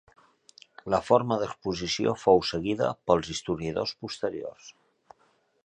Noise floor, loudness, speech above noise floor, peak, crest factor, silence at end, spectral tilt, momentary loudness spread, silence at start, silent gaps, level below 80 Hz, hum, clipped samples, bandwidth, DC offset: -67 dBFS; -27 LUFS; 40 dB; -6 dBFS; 22 dB; 0.95 s; -5 dB/octave; 10 LU; 0.85 s; none; -56 dBFS; none; under 0.1%; 9.6 kHz; under 0.1%